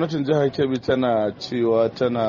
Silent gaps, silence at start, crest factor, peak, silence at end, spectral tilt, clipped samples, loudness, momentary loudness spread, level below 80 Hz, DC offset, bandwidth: none; 0 s; 14 dB; -8 dBFS; 0 s; -5.5 dB/octave; under 0.1%; -21 LUFS; 3 LU; -56 dBFS; under 0.1%; 7.2 kHz